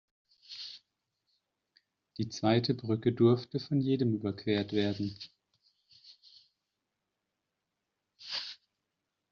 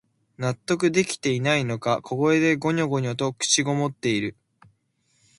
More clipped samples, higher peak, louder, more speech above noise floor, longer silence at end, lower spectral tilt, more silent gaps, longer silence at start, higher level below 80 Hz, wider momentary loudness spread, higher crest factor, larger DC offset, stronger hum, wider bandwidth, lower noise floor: neither; second, -14 dBFS vs -6 dBFS; second, -31 LUFS vs -23 LUFS; first, 56 dB vs 45 dB; second, 0.75 s vs 1.05 s; first, -6 dB/octave vs -4.5 dB/octave; neither; about the same, 0.5 s vs 0.4 s; second, -72 dBFS vs -62 dBFS; first, 21 LU vs 7 LU; about the same, 22 dB vs 18 dB; neither; neither; second, 7 kHz vs 11.5 kHz; first, -86 dBFS vs -69 dBFS